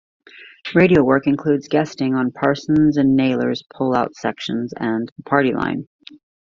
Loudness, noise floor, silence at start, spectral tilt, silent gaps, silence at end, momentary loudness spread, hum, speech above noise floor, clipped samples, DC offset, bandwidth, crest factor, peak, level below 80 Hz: -18 LUFS; -37 dBFS; 0.35 s; -7 dB/octave; 5.12-5.16 s; 0.65 s; 10 LU; none; 19 dB; under 0.1%; under 0.1%; 7.2 kHz; 18 dB; -2 dBFS; -52 dBFS